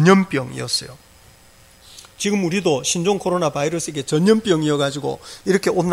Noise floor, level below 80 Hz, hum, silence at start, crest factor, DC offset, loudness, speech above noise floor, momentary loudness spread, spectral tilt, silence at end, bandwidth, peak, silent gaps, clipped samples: -49 dBFS; -54 dBFS; none; 0 s; 18 dB; under 0.1%; -20 LUFS; 30 dB; 9 LU; -5 dB/octave; 0 s; 15.5 kHz; 0 dBFS; none; under 0.1%